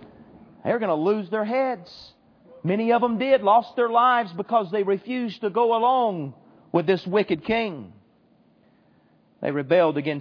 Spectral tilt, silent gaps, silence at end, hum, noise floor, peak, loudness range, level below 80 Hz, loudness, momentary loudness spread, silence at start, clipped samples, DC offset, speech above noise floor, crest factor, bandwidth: -8 dB/octave; none; 0 s; none; -60 dBFS; -6 dBFS; 5 LU; -64 dBFS; -23 LUFS; 12 LU; 0 s; under 0.1%; under 0.1%; 37 dB; 18 dB; 5.4 kHz